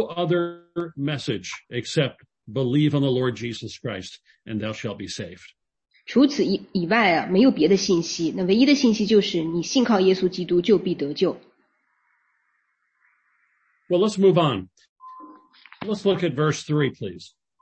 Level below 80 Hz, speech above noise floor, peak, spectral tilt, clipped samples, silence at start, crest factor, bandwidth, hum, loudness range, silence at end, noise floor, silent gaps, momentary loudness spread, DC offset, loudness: -62 dBFS; 49 dB; -4 dBFS; -5.5 dB/octave; under 0.1%; 0 s; 18 dB; 8.6 kHz; none; 7 LU; 0.35 s; -71 dBFS; 14.89-14.96 s; 14 LU; under 0.1%; -22 LUFS